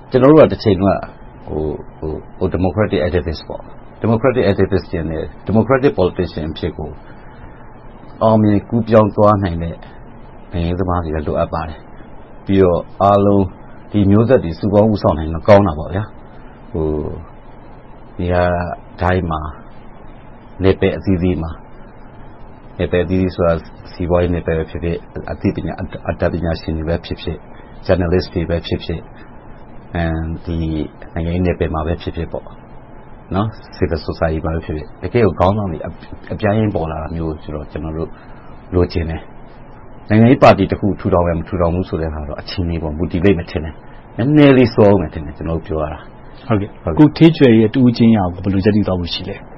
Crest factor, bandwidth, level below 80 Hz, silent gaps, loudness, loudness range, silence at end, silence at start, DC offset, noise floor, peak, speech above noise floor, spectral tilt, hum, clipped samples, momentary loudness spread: 16 dB; 6.2 kHz; -32 dBFS; none; -16 LUFS; 8 LU; 0 s; 0 s; under 0.1%; -36 dBFS; 0 dBFS; 21 dB; -7 dB/octave; none; under 0.1%; 16 LU